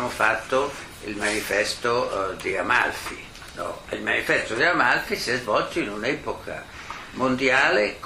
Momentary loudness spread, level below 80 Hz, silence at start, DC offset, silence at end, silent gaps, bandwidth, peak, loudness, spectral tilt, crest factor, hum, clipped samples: 16 LU; -50 dBFS; 0 s; under 0.1%; 0 s; none; 15.5 kHz; -6 dBFS; -23 LUFS; -3.5 dB/octave; 20 dB; none; under 0.1%